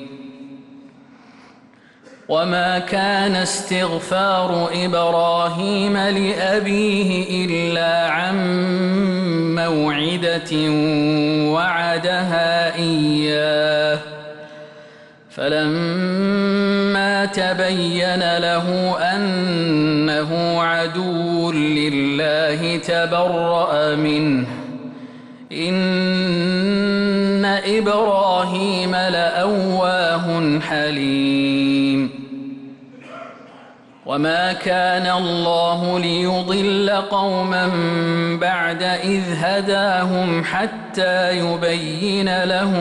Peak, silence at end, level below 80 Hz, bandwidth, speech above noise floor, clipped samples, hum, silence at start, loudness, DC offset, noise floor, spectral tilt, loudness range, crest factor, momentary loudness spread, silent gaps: -8 dBFS; 0 s; -56 dBFS; 11.5 kHz; 31 dB; under 0.1%; none; 0 s; -18 LUFS; under 0.1%; -49 dBFS; -5.5 dB/octave; 3 LU; 10 dB; 4 LU; none